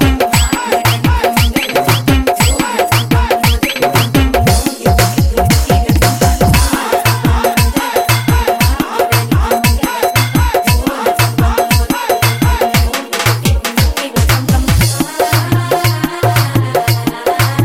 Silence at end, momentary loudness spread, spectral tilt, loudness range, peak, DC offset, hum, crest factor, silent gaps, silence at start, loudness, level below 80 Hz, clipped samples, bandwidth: 0 s; 3 LU; -4.5 dB/octave; 1 LU; 0 dBFS; 0.4%; none; 10 dB; none; 0 s; -12 LUFS; -18 dBFS; under 0.1%; 17 kHz